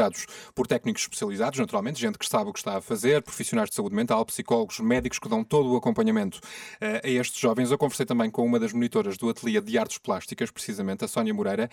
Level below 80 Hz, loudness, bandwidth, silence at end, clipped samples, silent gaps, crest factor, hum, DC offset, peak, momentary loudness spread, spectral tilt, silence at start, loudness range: -58 dBFS; -27 LUFS; 17.5 kHz; 0.05 s; under 0.1%; none; 16 dB; none; under 0.1%; -10 dBFS; 7 LU; -4.5 dB/octave; 0 s; 2 LU